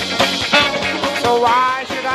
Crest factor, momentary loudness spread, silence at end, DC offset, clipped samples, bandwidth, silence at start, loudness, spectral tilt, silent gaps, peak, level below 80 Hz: 16 dB; 5 LU; 0 s; under 0.1%; under 0.1%; 14 kHz; 0 s; -15 LUFS; -2.5 dB/octave; none; 0 dBFS; -46 dBFS